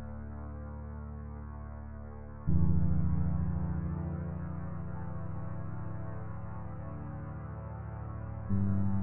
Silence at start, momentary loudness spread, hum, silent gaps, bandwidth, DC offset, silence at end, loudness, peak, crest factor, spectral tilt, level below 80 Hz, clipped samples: 0 s; 13 LU; none; none; 2.7 kHz; under 0.1%; 0 s; -37 LUFS; -14 dBFS; 18 dB; -13.5 dB/octave; -44 dBFS; under 0.1%